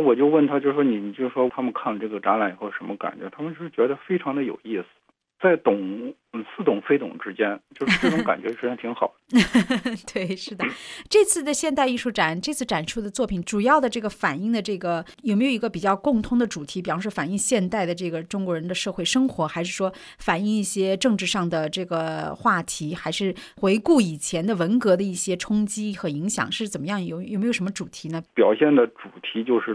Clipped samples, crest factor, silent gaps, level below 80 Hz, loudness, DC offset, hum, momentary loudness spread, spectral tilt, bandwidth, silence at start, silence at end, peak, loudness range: under 0.1%; 18 dB; none; -54 dBFS; -24 LUFS; under 0.1%; none; 10 LU; -4.5 dB/octave; 11 kHz; 0 s; 0 s; -6 dBFS; 3 LU